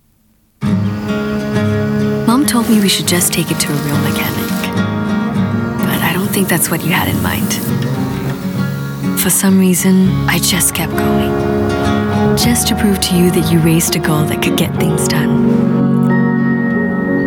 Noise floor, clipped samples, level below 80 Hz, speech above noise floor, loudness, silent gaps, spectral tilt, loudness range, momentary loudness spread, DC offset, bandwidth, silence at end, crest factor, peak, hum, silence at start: -54 dBFS; under 0.1%; -36 dBFS; 41 dB; -13 LUFS; none; -4.5 dB/octave; 3 LU; 6 LU; under 0.1%; 19 kHz; 0 s; 12 dB; 0 dBFS; none; 0.6 s